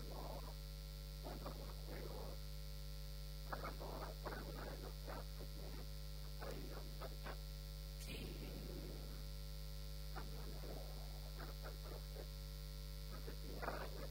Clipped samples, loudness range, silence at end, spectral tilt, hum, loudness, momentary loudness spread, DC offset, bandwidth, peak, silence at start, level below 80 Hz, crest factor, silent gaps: under 0.1%; 1 LU; 0 s; -5 dB/octave; 50 Hz at -50 dBFS; -51 LUFS; 3 LU; under 0.1%; 16 kHz; -32 dBFS; 0 s; -50 dBFS; 18 dB; none